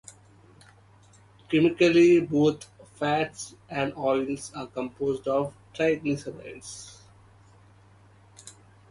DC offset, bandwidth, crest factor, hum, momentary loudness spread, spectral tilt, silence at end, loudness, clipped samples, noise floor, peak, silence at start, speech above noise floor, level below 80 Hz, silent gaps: under 0.1%; 11.5 kHz; 18 dB; none; 21 LU; -5.5 dB/octave; 0.4 s; -25 LUFS; under 0.1%; -56 dBFS; -10 dBFS; 1.5 s; 31 dB; -62 dBFS; none